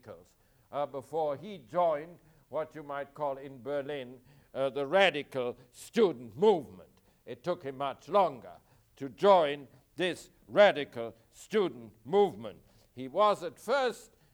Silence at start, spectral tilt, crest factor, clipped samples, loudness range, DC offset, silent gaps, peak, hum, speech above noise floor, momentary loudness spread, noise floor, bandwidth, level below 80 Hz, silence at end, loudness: 0.05 s; -5 dB/octave; 22 dB; under 0.1%; 7 LU; under 0.1%; none; -10 dBFS; none; 34 dB; 20 LU; -65 dBFS; 18.5 kHz; -72 dBFS; 0.35 s; -31 LUFS